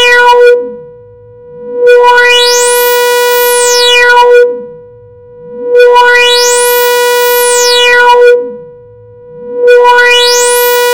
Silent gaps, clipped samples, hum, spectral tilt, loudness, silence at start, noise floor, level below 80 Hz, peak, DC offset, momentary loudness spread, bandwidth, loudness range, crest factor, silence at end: none; 6%; none; 1 dB/octave; -4 LUFS; 0 s; -33 dBFS; -46 dBFS; 0 dBFS; under 0.1%; 8 LU; over 20 kHz; 2 LU; 6 dB; 0 s